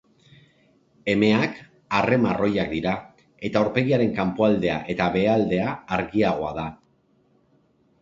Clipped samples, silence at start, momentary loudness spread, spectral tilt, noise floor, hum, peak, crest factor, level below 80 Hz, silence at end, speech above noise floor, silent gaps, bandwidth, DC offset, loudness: under 0.1%; 1.05 s; 10 LU; -7.5 dB/octave; -63 dBFS; none; -4 dBFS; 20 dB; -52 dBFS; 1.25 s; 41 dB; none; 7.6 kHz; under 0.1%; -23 LUFS